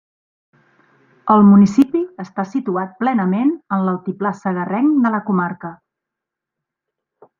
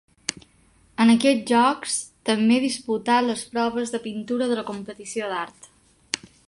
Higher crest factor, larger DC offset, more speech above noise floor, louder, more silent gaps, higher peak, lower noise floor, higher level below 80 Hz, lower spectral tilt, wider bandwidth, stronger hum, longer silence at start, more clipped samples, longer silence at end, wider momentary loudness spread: second, 16 dB vs 22 dB; neither; first, 67 dB vs 36 dB; first, -17 LUFS vs -23 LUFS; neither; about the same, -2 dBFS vs -2 dBFS; first, -83 dBFS vs -58 dBFS; about the same, -60 dBFS vs -64 dBFS; first, -9 dB/octave vs -3.5 dB/octave; second, 7.2 kHz vs 11.5 kHz; neither; first, 1.25 s vs 0.3 s; neither; first, 1.65 s vs 0.3 s; about the same, 15 LU vs 13 LU